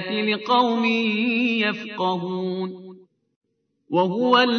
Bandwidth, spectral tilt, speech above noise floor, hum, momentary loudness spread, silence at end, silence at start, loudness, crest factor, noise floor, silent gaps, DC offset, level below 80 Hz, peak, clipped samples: 6.6 kHz; -6 dB/octave; 25 dB; none; 9 LU; 0 s; 0 s; -22 LUFS; 18 dB; -46 dBFS; 3.36-3.41 s; under 0.1%; -82 dBFS; -4 dBFS; under 0.1%